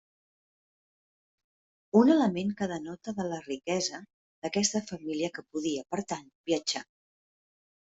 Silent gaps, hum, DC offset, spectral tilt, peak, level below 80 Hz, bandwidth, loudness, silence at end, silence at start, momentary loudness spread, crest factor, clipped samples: 4.14-4.42 s, 6.35-6.44 s; none; under 0.1%; -4 dB/octave; -10 dBFS; -72 dBFS; 8.2 kHz; -30 LUFS; 1 s; 1.95 s; 14 LU; 22 dB; under 0.1%